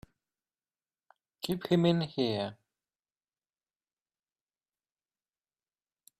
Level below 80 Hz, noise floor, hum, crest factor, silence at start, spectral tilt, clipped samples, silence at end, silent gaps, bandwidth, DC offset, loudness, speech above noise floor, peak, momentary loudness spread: -70 dBFS; under -90 dBFS; none; 24 dB; 1.45 s; -7 dB/octave; under 0.1%; 3.65 s; none; 13.5 kHz; under 0.1%; -31 LUFS; over 61 dB; -14 dBFS; 12 LU